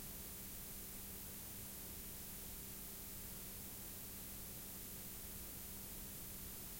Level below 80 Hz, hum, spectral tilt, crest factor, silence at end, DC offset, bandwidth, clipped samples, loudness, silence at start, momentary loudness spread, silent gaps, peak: -60 dBFS; none; -2.5 dB/octave; 14 dB; 0 s; under 0.1%; 16.5 kHz; under 0.1%; -49 LUFS; 0 s; 0 LU; none; -38 dBFS